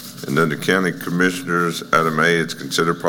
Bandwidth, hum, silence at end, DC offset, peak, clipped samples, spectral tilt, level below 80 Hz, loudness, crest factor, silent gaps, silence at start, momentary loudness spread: 17.5 kHz; none; 0 s; under 0.1%; -2 dBFS; under 0.1%; -4.5 dB/octave; -58 dBFS; -19 LUFS; 18 dB; none; 0 s; 5 LU